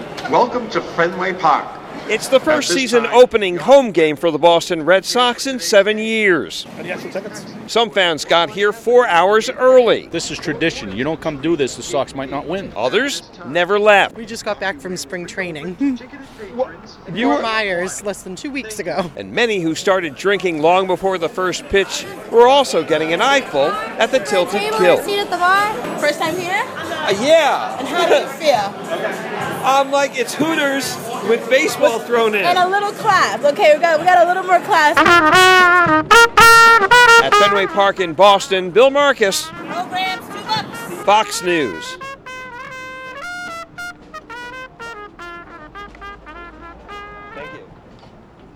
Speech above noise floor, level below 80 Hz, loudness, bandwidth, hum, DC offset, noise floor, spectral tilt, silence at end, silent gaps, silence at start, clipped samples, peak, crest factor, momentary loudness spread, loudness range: 27 dB; -48 dBFS; -15 LUFS; 19 kHz; none; under 0.1%; -42 dBFS; -3 dB/octave; 0.9 s; none; 0 s; under 0.1%; 0 dBFS; 16 dB; 20 LU; 14 LU